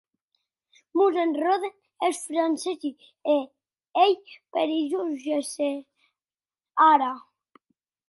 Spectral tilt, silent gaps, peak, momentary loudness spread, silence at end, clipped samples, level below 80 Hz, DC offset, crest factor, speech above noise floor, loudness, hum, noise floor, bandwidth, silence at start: -2 dB/octave; none; -6 dBFS; 13 LU; 0.9 s; under 0.1%; -84 dBFS; under 0.1%; 20 dB; over 66 dB; -25 LUFS; none; under -90 dBFS; 11.5 kHz; 0.95 s